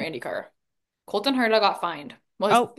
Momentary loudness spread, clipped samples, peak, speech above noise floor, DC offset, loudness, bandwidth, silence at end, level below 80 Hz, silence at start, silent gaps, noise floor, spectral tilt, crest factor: 15 LU; under 0.1%; -6 dBFS; 58 dB; under 0.1%; -24 LUFS; 12.5 kHz; 0.05 s; -74 dBFS; 0 s; none; -82 dBFS; -4 dB/octave; 20 dB